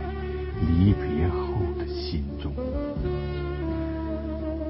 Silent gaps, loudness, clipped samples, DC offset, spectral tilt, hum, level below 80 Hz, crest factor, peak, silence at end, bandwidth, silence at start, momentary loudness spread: none; -28 LUFS; under 0.1%; under 0.1%; -12 dB/octave; none; -32 dBFS; 16 dB; -10 dBFS; 0 s; 5.8 kHz; 0 s; 10 LU